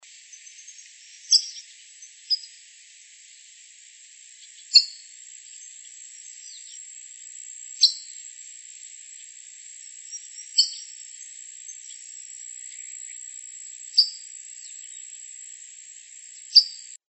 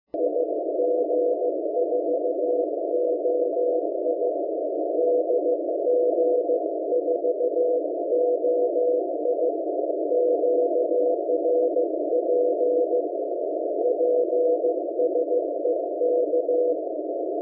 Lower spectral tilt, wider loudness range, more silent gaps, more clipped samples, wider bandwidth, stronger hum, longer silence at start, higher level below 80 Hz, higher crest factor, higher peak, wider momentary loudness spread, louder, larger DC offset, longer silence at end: second, 12 dB/octave vs -12 dB/octave; first, 5 LU vs 1 LU; neither; neither; first, 8.8 kHz vs 0.8 kHz; neither; second, 0 s vs 0.15 s; about the same, under -90 dBFS vs -88 dBFS; first, 28 dB vs 10 dB; first, -2 dBFS vs -14 dBFS; first, 25 LU vs 4 LU; first, -20 LUFS vs -24 LUFS; neither; first, 0.15 s vs 0 s